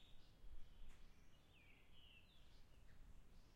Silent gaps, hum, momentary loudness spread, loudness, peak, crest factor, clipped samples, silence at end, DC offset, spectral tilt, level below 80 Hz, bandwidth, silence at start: none; none; 2 LU; -68 LUFS; -44 dBFS; 16 dB; under 0.1%; 0 s; under 0.1%; -4.5 dB/octave; -64 dBFS; 14 kHz; 0 s